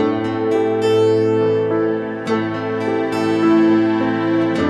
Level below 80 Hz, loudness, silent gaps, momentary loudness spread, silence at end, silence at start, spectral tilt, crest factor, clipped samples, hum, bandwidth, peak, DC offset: -56 dBFS; -17 LUFS; none; 7 LU; 0 s; 0 s; -7 dB/octave; 12 dB; under 0.1%; none; 9.8 kHz; -4 dBFS; under 0.1%